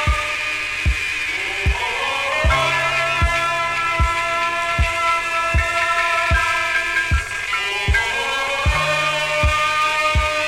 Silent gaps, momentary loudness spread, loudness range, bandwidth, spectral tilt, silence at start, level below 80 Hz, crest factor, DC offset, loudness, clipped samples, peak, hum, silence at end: none; 4 LU; 1 LU; 16 kHz; -3 dB/octave; 0 s; -26 dBFS; 14 dB; under 0.1%; -18 LUFS; under 0.1%; -4 dBFS; none; 0 s